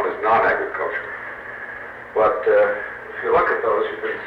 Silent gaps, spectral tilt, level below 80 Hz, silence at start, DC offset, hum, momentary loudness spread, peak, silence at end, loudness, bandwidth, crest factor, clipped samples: none; -6 dB/octave; -54 dBFS; 0 s; under 0.1%; 60 Hz at -55 dBFS; 15 LU; -8 dBFS; 0 s; -20 LUFS; 5.6 kHz; 14 dB; under 0.1%